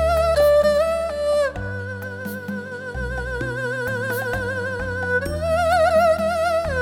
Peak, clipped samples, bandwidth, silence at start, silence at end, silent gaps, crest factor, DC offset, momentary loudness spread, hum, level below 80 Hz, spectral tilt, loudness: -8 dBFS; under 0.1%; 17.5 kHz; 0 s; 0 s; none; 14 dB; under 0.1%; 14 LU; none; -36 dBFS; -5.5 dB/octave; -21 LUFS